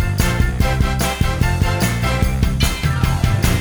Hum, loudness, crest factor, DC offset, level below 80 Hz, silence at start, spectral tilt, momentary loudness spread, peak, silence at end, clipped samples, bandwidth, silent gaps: none; -18 LUFS; 14 dB; under 0.1%; -20 dBFS; 0 s; -5 dB/octave; 1 LU; -2 dBFS; 0 s; under 0.1%; over 20 kHz; none